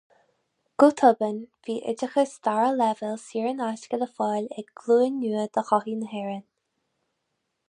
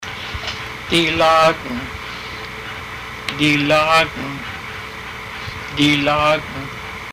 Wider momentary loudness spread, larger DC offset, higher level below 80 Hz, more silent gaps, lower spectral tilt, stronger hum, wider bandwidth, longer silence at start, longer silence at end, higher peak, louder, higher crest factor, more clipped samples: about the same, 13 LU vs 15 LU; neither; second, -80 dBFS vs -42 dBFS; neither; about the same, -5.5 dB/octave vs -4.5 dB/octave; neither; second, 10.5 kHz vs 15.5 kHz; first, 0.8 s vs 0 s; first, 1.3 s vs 0 s; about the same, -4 dBFS vs -6 dBFS; second, -25 LUFS vs -18 LUFS; first, 22 dB vs 14 dB; neither